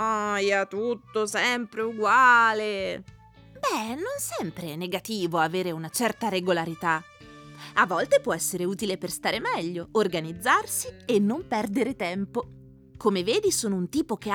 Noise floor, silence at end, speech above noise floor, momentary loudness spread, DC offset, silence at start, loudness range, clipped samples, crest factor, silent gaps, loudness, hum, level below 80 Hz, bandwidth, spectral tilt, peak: -47 dBFS; 0 s; 21 dB; 9 LU; under 0.1%; 0 s; 5 LU; under 0.1%; 18 dB; none; -26 LUFS; none; -60 dBFS; 20 kHz; -3.5 dB/octave; -8 dBFS